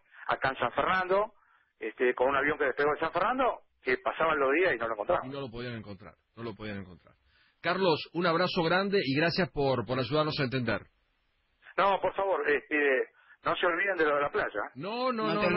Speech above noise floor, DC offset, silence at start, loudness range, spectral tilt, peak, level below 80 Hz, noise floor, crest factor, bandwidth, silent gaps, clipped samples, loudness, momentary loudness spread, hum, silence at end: 44 dB; under 0.1%; 0.15 s; 4 LU; -9.5 dB/octave; -14 dBFS; -60 dBFS; -73 dBFS; 16 dB; 5.8 kHz; none; under 0.1%; -29 LUFS; 12 LU; none; 0 s